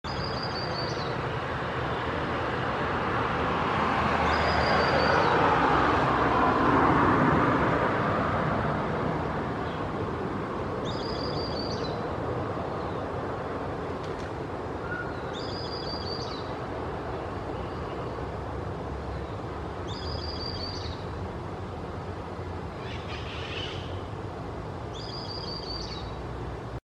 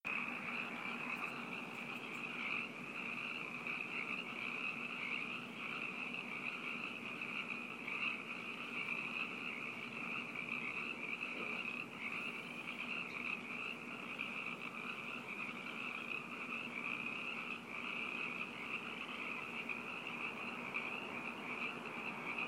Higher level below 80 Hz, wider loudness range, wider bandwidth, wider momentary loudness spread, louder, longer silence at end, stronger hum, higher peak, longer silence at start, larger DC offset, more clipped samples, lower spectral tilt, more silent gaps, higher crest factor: first, -44 dBFS vs -84 dBFS; first, 12 LU vs 1 LU; second, 12 kHz vs 16 kHz; first, 14 LU vs 4 LU; first, -29 LUFS vs -42 LUFS; first, 0.15 s vs 0 s; neither; first, -10 dBFS vs -28 dBFS; about the same, 0.05 s vs 0.05 s; neither; neither; first, -6.5 dB/octave vs -4 dB/octave; neither; about the same, 20 dB vs 16 dB